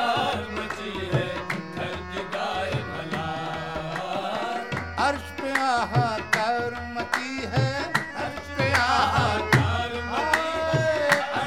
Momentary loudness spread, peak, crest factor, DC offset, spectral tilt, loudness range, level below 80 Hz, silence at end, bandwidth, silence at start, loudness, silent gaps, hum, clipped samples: 10 LU; -4 dBFS; 22 dB; 0.3%; -5 dB/octave; 6 LU; -48 dBFS; 0 s; 16.5 kHz; 0 s; -26 LUFS; none; none; under 0.1%